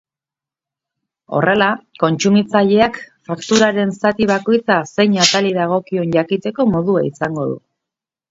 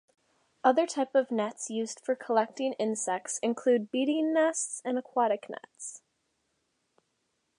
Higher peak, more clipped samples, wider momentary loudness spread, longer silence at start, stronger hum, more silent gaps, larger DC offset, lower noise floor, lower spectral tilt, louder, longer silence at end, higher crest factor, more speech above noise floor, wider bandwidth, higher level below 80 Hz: first, 0 dBFS vs -10 dBFS; neither; about the same, 9 LU vs 8 LU; first, 1.3 s vs 0.65 s; neither; neither; neither; first, -88 dBFS vs -78 dBFS; first, -4.5 dB/octave vs -3 dB/octave; first, -16 LUFS vs -29 LUFS; second, 0.75 s vs 1.6 s; second, 16 dB vs 22 dB; first, 73 dB vs 49 dB; second, 7.8 kHz vs 11 kHz; first, -54 dBFS vs -88 dBFS